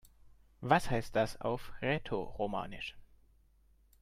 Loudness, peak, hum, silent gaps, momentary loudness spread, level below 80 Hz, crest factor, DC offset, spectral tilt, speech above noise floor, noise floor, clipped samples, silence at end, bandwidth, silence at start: -35 LUFS; -12 dBFS; none; none; 13 LU; -54 dBFS; 24 dB; under 0.1%; -6 dB/octave; 32 dB; -67 dBFS; under 0.1%; 0.95 s; 15 kHz; 0.05 s